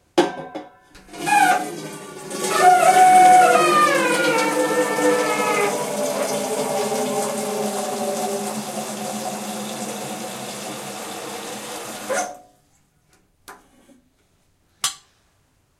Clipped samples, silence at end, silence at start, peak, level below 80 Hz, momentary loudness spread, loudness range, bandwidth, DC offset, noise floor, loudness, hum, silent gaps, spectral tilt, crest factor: under 0.1%; 0.85 s; 0.15 s; -2 dBFS; -68 dBFS; 18 LU; 17 LU; 16 kHz; under 0.1%; -63 dBFS; -19 LUFS; none; none; -2.5 dB/octave; 20 dB